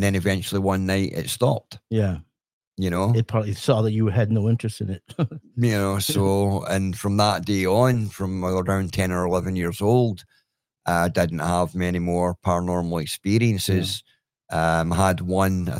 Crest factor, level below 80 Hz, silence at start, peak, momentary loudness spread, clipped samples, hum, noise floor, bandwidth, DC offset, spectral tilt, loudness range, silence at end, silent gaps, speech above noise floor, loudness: 18 dB; -52 dBFS; 0 s; -4 dBFS; 7 LU; under 0.1%; none; -53 dBFS; 16.5 kHz; under 0.1%; -6 dB/octave; 2 LU; 0 s; 2.53-2.61 s, 2.67-2.72 s; 31 dB; -23 LUFS